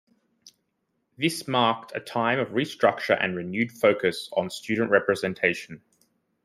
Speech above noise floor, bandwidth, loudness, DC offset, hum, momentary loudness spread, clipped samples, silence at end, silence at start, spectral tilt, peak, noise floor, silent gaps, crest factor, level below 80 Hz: 51 dB; 15.5 kHz; -25 LUFS; under 0.1%; none; 7 LU; under 0.1%; 0.65 s; 0.45 s; -5 dB/octave; -6 dBFS; -76 dBFS; none; 22 dB; -70 dBFS